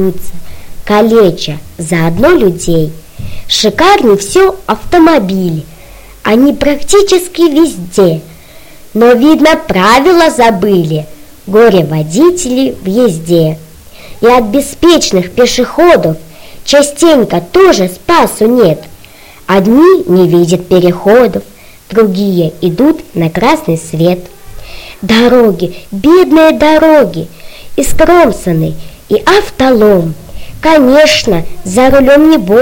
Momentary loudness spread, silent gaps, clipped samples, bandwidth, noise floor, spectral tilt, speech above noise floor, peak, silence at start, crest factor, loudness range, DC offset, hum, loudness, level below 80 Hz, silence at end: 13 LU; none; 1%; 17.5 kHz; -34 dBFS; -5 dB/octave; 27 dB; 0 dBFS; 0 s; 8 dB; 3 LU; under 0.1%; none; -8 LUFS; -30 dBFS; 0 s